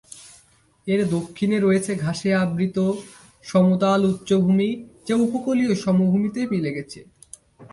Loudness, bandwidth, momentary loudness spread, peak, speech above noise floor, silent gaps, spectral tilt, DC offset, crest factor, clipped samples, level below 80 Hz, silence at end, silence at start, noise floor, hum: -21 LUFS; 11.5 kHz; 14 LU; -6 dBFS; 36 dB; none; -7 dB/octave; under 0.1%; 16 dB; under 0.1%; -58 dBFS; 0.05 s; 0.15 s; -57 dBFS; none